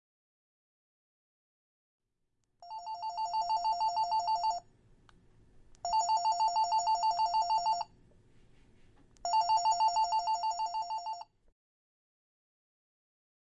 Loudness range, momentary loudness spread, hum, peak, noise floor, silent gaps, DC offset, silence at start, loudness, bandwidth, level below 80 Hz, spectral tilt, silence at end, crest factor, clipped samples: 8 LU; 13 LU; none; -20 dBFS; -80 dBFS; none; under 0.1%; 2.6 s; -32 LUFS; 8.2 kHz; -68 dBFS; 0 dB/octave; 2.3 s; 14 dB; under 0.1%